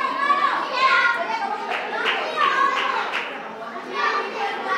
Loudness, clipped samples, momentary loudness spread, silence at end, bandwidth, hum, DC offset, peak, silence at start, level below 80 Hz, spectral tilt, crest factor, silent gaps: -21 LUFS; under 0.1%; 11 LU; 0 s; 13 kHz; none; under 0.1%; -6 dBFS; 0 s; -80 dBFS; -2 dB/octave; 16 dB; none